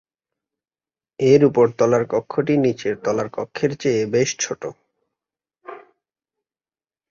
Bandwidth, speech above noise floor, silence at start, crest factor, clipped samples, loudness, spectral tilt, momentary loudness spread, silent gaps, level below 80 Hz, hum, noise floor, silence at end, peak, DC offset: 7.6 kHz; over 71 dB; 1.2 s; 20 dB; under 0.1%; -19 LUFS; -5.5 dB/octave; 16 LU; none; -60 dBFS; none; under -90 dBFS; 1.35 s; -2 dBFS; under 0.1%